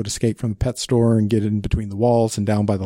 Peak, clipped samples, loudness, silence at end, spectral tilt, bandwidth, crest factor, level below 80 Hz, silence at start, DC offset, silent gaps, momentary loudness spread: -6 dBFS; under 0.1%; -20 LUFS; 0 s; -6.5 dB/octave; 16 kHz; 14 dB; -36 dBFS; 0 s; under 0.1%; none; 6 LU